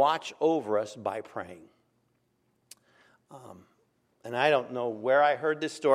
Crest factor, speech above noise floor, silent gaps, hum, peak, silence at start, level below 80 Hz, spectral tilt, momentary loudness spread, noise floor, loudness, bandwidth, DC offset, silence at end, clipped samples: 20 dB; 45 dB; none; none; -8 dBFS; 0 s; -82 dBFS; -4.5 dB/octave; 20 LU; -73 dBFS; -28 LUFS; 13.5 kHz; under 0.1%; 0 s; under 0.1%